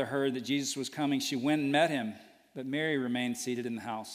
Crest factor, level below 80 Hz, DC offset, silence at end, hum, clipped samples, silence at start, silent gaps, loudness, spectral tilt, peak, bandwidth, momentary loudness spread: 20 dB; -78 dBFS; under 0.1%; 0 s; none; under 0.1%; 0 s; none; -32 LUFS; -4 dB/octave; -12 dBFS; 15.5 kHz; 11 LU